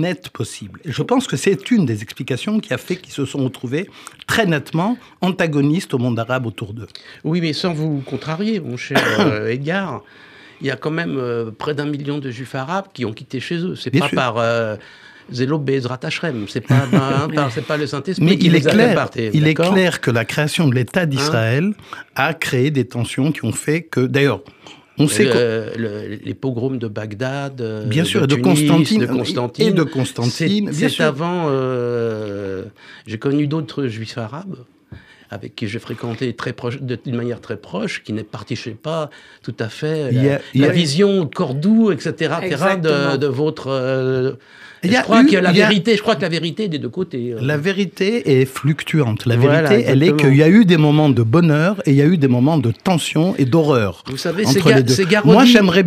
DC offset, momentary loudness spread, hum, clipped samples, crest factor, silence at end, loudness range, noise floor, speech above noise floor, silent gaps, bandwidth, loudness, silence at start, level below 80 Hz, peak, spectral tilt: under 0.1%; 14 LU; none; under 0.1%; 16 dB; 0 s; 10 LU; -41 dBFS; 24 dB; none; 15.5 kHz; -17 LUFS; 0 s; -60 dBFS; 0 dBFS; -6 dB/octave